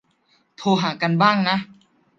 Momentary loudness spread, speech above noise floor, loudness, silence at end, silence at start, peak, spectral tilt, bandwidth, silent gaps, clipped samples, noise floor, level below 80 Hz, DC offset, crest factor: 10 LU; 44 dB; -20 LUFS; 0.55 s; 0.6 s; -2 dBFS; -6 dB/octave; 7.4 kHz; none; under 0.1%; -63 dBFS; -68 dBFS; under 0.1%; 20 dB